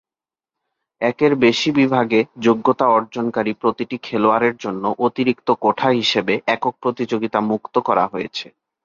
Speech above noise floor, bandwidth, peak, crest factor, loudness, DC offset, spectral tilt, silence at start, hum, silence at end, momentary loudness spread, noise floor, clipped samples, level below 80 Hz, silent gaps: over 72 dB; 7.6 kHz; -2 dBFS; 16 dB; -18 LUFS; under 0.1%; -5.5 dB/octave; 1 s; none; 0.4 s; 8 LU; under -90 dBFS; under 0.1%; -62 dBFS; none